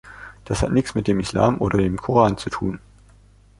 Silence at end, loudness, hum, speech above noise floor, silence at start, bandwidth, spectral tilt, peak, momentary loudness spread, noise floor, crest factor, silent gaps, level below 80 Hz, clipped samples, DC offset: 0.8 s; -21 LUFS; 50 Hz at -40 dBFS; 31 dB; 0.05 s; 11.5 kHz; -6.5 dB/octave; -2 dBFS; 13 LU; -51 dBFS; 20 dB; none; -38 dBFS; under 0.1%; under 0.1%